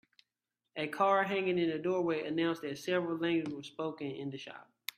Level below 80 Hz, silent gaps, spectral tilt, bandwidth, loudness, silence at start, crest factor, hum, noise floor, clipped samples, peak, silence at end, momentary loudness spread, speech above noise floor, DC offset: -80 dBFS; none; -5.5 dB/octave; 15 kHz; -34 LUFS; 0.75 s; 20 dB; none; -89 dBFS; under 0.1%; -14 dBFS; 0.35 s; 13 LU; 55 dB; under 0.1%